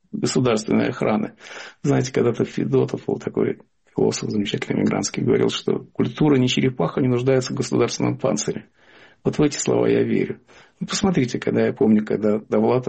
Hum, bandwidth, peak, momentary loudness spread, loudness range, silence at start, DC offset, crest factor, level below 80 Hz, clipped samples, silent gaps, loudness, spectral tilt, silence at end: none; 8.8 kHz; -8 dBFS; 8 LU; 2 LU; 0.15 s; under 0.1%; 14 dB; -54 dBFS; under 0.1%; none; -21 LUFS; -5.5 dB/octave; 0 s